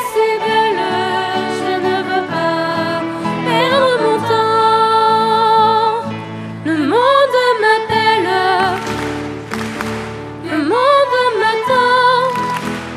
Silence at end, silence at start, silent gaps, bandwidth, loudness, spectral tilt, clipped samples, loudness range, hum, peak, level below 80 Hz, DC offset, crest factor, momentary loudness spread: 0 s; 0 s; none; 14.5 kHz; -14 LUFS; -4.5 dB/octave; under 0.1%; 3 LU; none; 0 dBFS; -50 dBFS; under 0.1%; 14 dB; 11 LU